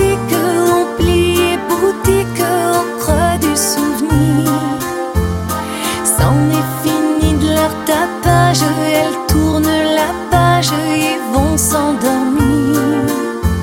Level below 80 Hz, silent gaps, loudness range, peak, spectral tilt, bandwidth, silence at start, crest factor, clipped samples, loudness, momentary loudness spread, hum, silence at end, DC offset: -28 dBFS; none; 2 LU; 0 dBFS; -5 dB/octave; 17 kHz; 0 s; 14 dB; under 0.1%; -14 LUFS; 5 LU; none; 0 s; under 0.1%